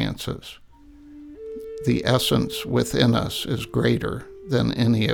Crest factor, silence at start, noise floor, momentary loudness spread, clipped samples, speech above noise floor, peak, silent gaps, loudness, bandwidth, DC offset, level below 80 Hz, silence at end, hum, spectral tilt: 20 dB; 0 s; -47 dBFS; 16 LU; under 0.1%; 25 dB; -4 dBFS; none; -23 LUFS; 19 kHz; under 0.1%; -44 dBFS; 0 s; none; -5.5 dB/octave